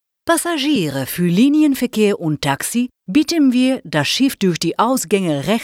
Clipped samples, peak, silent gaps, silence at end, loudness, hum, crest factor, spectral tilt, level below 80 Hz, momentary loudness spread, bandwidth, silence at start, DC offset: under 0.1%; -2 dBFS; none; 0 s; -17 LUFS; none; 14 dB; -4.5 dB/octave; -54 dBFS; 5 LU; 16.5 kHz; 0.25 s; under 0.1%